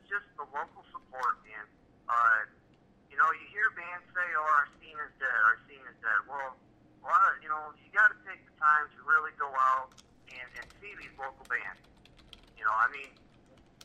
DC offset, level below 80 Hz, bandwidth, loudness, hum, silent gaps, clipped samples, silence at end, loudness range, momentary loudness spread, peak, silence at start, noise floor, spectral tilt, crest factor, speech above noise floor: under 0.1%; -68 dBFS; 11.5 kHz; -29 LUFS; none; none; under 0.1%; 0.75 s; 7 LU; 20 LU; -12 dBFS; 0.1 s; -63 dBFS; -3 dB/octave; 20 dB; 31 dB